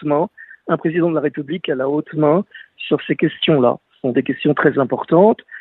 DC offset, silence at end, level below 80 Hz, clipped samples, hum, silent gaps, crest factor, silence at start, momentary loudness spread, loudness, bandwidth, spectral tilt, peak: under 0.1%; 0 s; -62 dBFS; under 0.1%; none; none; 16 dB; 0 s; 9 LU; -18 LUFS; 4.1 kHz; -10 dB/octave; 0 dBFS